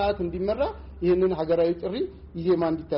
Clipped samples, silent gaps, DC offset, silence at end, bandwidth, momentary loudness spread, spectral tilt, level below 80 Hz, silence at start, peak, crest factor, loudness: under 0.1%; none; under 0.1%; 0 s; 5.6 kHz; 8 LU; -6.5 dB/octave; -44 dBFS; 0 s; -14 dBFS; 12 dB; -26 LUFS